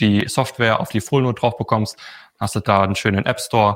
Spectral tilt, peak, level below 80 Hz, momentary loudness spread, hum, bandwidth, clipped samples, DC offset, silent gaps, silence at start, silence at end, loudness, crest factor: -5.5 dB/octave; -2 dBFS; -50 dBFS; 10 LU; none; 16.5 kHz; under 0.1%; under 0.1%; none; 0 s; 0 s; -19 LUFS; 18 dB